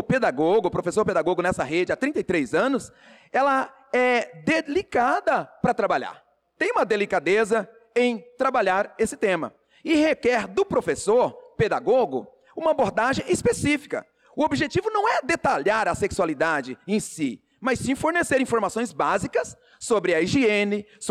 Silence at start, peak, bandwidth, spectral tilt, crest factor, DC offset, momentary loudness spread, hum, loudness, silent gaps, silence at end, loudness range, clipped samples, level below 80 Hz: 0 s; -12 dBFS; 14 kHz; -5 dB/octave; 12 dB; under 0.1%; 7 LU; none; -23 LUFS; none; 0 s; 1 LU; under 0.1%; -54 dBFS